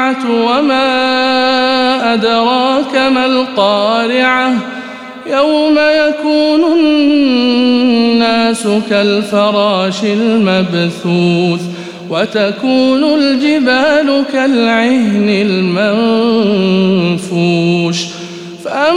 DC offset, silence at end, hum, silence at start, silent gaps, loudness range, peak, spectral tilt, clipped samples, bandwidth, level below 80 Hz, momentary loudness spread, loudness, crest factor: 0.3%; 0 s; none; 0 s; none; 2 LU; 0 dBFS; -5.5 dB/octave; under 0.1%; 12 kHz; -56 dBFS; 5 LU; -11 LUFS; 10 dB